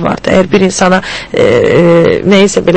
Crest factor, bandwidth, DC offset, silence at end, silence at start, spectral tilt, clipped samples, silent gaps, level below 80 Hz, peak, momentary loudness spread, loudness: 8 dB; 8.8 kHz; under 0.1%; 0 s; 0 s; -5.5 dB/octave; 1%; none; -36 dBFS; 0 dBFS; 4 LU; -8 LUFS